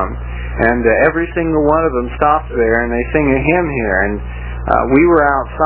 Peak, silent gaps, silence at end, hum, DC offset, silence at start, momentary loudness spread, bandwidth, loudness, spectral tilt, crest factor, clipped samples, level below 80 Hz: 0 dBFS; none; 0 s; 60 Hz at -25 dBFS; under 0.1%; 0 s; 10 LU; 4 kHz; -14 LUFS; -11 dB/octave; 14 dB; under 0.1%; -26 dBFS